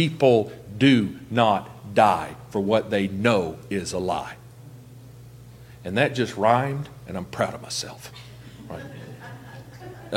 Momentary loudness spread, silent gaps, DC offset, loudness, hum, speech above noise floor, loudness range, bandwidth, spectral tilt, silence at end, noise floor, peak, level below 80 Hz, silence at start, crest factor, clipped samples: 22 LU; none; under 0.1%; -23 LUFS; none; 22 dB; 7 LU; 16.5 kHz; -5.5 dB/octave; 0 s; -45 dBFS; -2 dBFS; -56 dBFS; 0 s; 22 dB; under 0.1%